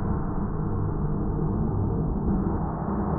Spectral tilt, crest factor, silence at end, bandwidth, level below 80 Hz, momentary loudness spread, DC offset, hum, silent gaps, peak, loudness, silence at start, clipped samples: -15 dB/octave; 12 dB; 0 s; 2.2 kHz; -32 dBFS; 3 LU; under 0.1%; none; none; -14 dBFS; -28 LUFS; 0 s; under 0.1%